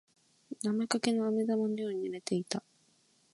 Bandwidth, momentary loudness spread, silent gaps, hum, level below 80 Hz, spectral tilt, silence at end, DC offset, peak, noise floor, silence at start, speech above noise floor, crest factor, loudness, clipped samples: 11.5 kHz; 8 LU; none; none; -82 dBFS; -5 dB/octave; 0.75 s; under 0.1%; -12 dBFS; -69 dBFS; 0.5 s; 37 dB; 22 dB; -33 LUFS; under 0.1%